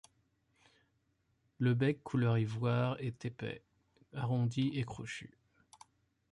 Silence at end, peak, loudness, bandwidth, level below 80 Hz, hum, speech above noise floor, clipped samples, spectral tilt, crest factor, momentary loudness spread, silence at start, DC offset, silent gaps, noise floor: 1.05 s; -20 dBFS; -36 LUFS; 11 kHz; -68 dBFS; none; 43 dB; under 0.1%; -7.5 dB/octave; 16 dB; 13 LU; 1.6 s; under 0.1%; none; -78 dBFS